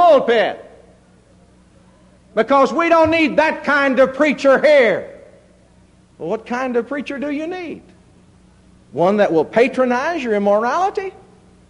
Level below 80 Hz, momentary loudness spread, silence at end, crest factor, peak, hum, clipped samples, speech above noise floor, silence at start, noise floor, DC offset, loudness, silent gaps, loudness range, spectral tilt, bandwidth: -52 dBFS; 14 LU; 0.6 s; 14 dB; -2 dBFS; none; under 0.1%; 34 dB; 0 s; -50 dBFS; under 0.1%; -16 LUFS; none; 11 LU; -5.5 dB/octave; 10.5 kHz